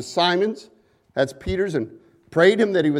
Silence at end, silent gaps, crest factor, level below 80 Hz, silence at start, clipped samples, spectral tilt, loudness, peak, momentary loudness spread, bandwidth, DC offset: 0 s; none; 18 dB; -46 dBFS; 0 s; under 0.1%; -5.5 dB/octave; -21 LUFS; -2 dBFS; 14 LU; 12 kHz; under 0.1%